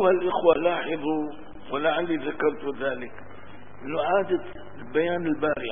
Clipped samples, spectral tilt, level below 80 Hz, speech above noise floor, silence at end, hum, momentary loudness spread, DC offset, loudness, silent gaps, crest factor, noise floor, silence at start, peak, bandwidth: under 0.1%; -10 dB/octave; -56 dBFS; 21 dB; 0 s; none; 20 LU; 1%; -26 LUFS; none; 20 dB; -46 dBFS; 0 s; -6 dBFS; 3.7 kHz